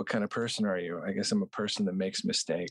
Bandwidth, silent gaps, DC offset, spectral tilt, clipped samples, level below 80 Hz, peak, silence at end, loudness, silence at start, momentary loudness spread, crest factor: 11.5 kHz; none; under 0.1%; -4 dB/octave; under 0.1%; -72 dBFS; -18 dBFS; 0 s; -31 LUFS; 0 s; 3 LU; 14 dB